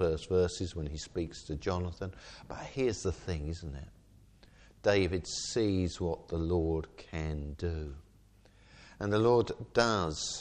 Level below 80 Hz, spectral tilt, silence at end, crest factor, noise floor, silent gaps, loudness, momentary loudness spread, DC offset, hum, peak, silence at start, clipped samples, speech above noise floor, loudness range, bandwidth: -48 dBFS; -5.5 dB/octave; 0 s; 22 dB; -61 dBFS; none; -33 LUFS; 14 LU; under 0.1%; none; -12 dBFS; 0 s; under 0.1%; 28 dB; 5 LU; 9.8 kHz